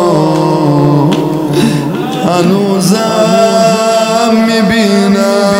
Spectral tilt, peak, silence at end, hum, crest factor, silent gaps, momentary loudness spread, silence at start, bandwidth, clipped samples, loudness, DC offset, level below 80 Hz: -5.5 dB/octave; 0 dBFS; 0 s; none; 8 dB; none; 4 LU; 0 s; 16.5 kHz; 0.7%; -9 LUFS; under 0.1%; -46 dBFS